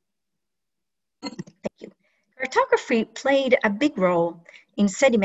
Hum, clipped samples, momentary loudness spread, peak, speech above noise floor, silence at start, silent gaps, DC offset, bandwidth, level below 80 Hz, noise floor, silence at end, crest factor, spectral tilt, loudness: none; under 0.1%; 17 LU; -4 dBFS; 65 dB; 1.25 s; none; under 0.1%; 8.2 kHz; -64 dBFS; -86 dBFS; 0 s; 20 dB; -5 dB/octave; -22 LUFS